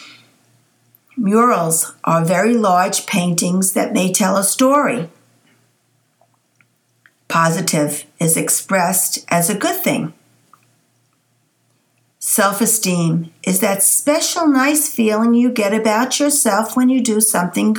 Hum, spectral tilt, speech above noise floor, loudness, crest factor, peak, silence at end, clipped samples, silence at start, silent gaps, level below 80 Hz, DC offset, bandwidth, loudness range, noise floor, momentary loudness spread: none; -4 dB/octave; 47 dB; -15 LUFS; 16 dB; 0 dBFS; 0 s; under 0.1%; 0 s; none; -70 dBFS; under 0.1%; over 20 kHz; 6 LU; -62 dBFS; 6 LU